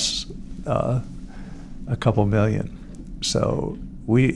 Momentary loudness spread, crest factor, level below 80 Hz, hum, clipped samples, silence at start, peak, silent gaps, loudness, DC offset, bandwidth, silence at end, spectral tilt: 20 LU; 18 dB; -38 dBFS; none; under 0.1%; 0 s; -4 dBFS; none; -24 LUFS; under 0.1%; 11.5 kHz; 0 s; -5.5 dB/octave